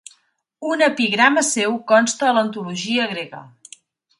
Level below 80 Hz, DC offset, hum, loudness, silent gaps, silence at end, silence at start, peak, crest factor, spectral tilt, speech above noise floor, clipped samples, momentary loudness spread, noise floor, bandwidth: -70 dBFS; under 0.1%; none; -18 LUFS; none; 0.7 s; 0.6 s; 0 dBFS; 20 dB; -2.5 dB/octave; 40 dB; under 0.1%; 15 LU; -59 dBFS; 11.5 kHz